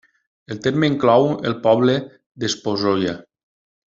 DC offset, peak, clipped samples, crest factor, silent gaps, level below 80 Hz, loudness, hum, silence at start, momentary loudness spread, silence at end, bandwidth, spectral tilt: under 0.1%; -2 dBFS; under 0.1%; 18 dB; 2.26-2.35 s; -58 dBFS; -19 LUFS; none; 0.5 s; 12 LU; 0.7 s; 7.8 kHz; -5.5 dB/octave